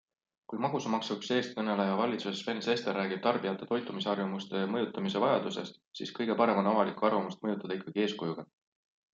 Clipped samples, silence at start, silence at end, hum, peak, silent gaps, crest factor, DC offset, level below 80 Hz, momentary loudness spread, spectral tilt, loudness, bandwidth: under 0.1%; 0.5 s; 0.7 s; none; -12 dBFS; 5.87-5.91 s; 20 dB; under 0.1%; -80 dBFS; 9 LU; -5.5 dB/octave; -32 LUFS; 7.6 kHz